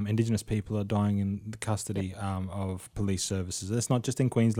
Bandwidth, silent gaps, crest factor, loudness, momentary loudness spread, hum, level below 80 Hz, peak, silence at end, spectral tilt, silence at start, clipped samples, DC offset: 16 kHz; none; 16 dB; -31 LUFS; 7 LU; none; -52 dBFS; -14 dBFS; 0 s; -6 dB/octave; 0 s; under 0.1%; under 0.1%